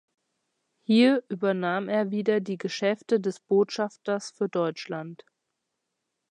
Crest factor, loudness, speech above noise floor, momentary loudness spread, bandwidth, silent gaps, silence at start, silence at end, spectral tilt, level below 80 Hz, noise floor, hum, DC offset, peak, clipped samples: 18 dB; -26 LUFS; 56 dB; 12 LU; 10 kHz; none; 0.9 s; 1.15 s; -6 dB/octave; -82 dBFS; -82 dBFS; none; under 0.1%; -10 dBFS; under 0.1%